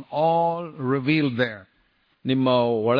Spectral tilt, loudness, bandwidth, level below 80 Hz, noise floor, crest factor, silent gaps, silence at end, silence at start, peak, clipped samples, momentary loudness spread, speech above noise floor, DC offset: -9 dB/octave; -23 LUFS; 5.2 kHz; -66 dBFS; -65 dBFS; 16 dB; none; 0 s; 0 s; -8 dBFS; under 0.1%; 8 LU; 43 dB; under 0.1%